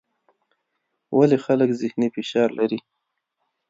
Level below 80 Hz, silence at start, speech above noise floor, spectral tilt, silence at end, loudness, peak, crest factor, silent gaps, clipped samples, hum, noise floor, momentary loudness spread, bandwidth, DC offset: -72 dBFS; 1.1 s; 56 dB; -7 dB/octave; 0.9 s; -21 LUFS; -4 dBFS; 20 dB; none; under 0.1%; none; -77 dBFS; 7 LU; 7.8 kHz; under 0.1%